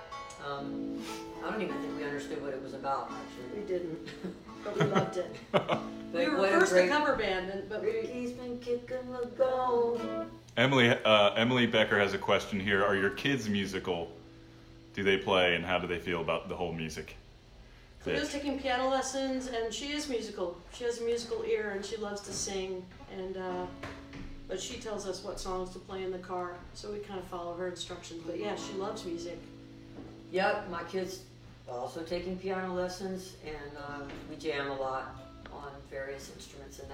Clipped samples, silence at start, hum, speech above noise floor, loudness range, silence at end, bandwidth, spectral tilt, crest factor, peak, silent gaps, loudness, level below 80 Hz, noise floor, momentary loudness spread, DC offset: under 0.1%; 0 s; none; 21 dB; 12 LU; 0 s; 16.5 kHz; -4.5 dB/octave; 22 dB; -10 dBFS; none; -32 LUFS; -56 dBFS; -54 dBFS; 17 LU; under 0.1%